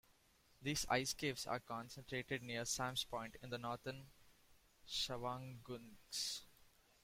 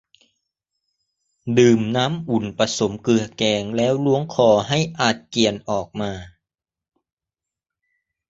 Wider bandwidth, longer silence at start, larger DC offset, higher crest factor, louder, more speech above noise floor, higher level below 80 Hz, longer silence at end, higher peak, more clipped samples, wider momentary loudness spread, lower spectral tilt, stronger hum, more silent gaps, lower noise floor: first, 16.5 kHz vs 8 kHz; second, 0.6 s vs 1.45 s; neither; about the same, 24 dB vs 20 dB; second, -44 LUFS vs -20 LUFS; second, 28 dB vs 68 dB; second, -68 dBFS vs -54 dBFS; second, 0.35 s vs 2 s; second, -22 dBFS vs -2 dBFS; neither; about the same, 12 LU vs 10 LU; second, -3 dB/octave vs -5 dB/octave; neither; neither; second, -73 dBFS vs -87 dBFS